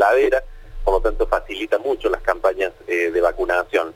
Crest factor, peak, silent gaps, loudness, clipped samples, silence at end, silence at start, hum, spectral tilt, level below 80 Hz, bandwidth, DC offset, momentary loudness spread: 16 dB; -2 dBFS; none; -20 LUFS; under 0.1%; 0.05 s; 0 s; none; -5 dB/octave; -32 dBFS; 17 kHz; under 0.1%; 5 LU